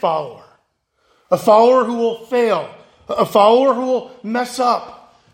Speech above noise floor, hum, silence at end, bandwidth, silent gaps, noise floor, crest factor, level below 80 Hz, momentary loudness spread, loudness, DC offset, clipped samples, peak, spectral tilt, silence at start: 50 dB; none; 0.4 s; 16.5 kHz; none; -65 dBFS; 16 dB; -64 dBFS; 12 LU; -16 LUFS; under 0.1%; under 0.1%; 0 dBFS; -5 dB/octave; 0.05 s